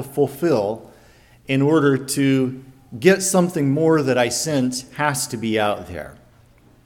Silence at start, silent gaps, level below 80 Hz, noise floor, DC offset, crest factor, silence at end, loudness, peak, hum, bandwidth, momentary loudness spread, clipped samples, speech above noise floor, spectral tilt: 0 s; none; -54 dBFS; -52 dBFS; under 0.1%; 18 dB; 0.7 s; -19 LUFS; -2 dBFS; none; 18.5 kHz; 14 LU; under 0.1%; 33 dB; -5 dB/octave